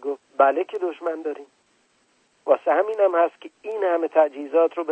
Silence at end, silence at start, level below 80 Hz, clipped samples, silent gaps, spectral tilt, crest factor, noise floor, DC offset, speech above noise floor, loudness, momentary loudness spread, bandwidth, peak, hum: 0 s; 0 s; -84 dBFS; under 0.1%; none; -4.5 dB/octave; 20 dB; -64 dBFS; under 0.1%; 43 dB; -22 LUFS; 13 LU; 8.4 kHz; -4 dBFS; none